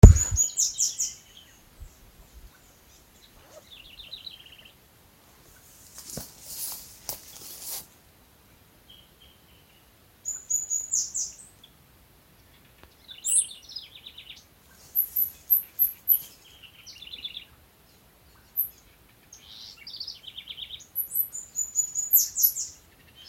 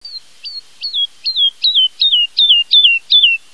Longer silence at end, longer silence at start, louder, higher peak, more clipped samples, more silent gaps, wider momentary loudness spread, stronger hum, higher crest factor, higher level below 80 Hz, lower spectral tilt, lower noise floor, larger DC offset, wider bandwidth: first, 0.55 s vs 0.15 s; about the same, 0.05 s vs 0.05 s; second, -26 LUFS vs -10 LUFS; about the same, 0 dBFS vs 0 dBFS; neither; neither; first, 24 LU vs 20 LU; neither; first, 28 dB vs 14 dB; first, -34 dBFS vs -72 dBFS; first, -4 dB/octave vs 3.5 dB/octave; first, -58 dBFS vs -31 dBFS; second, under 0.1% vs 0.8%; first, 16.5 kHz vs 11 kHz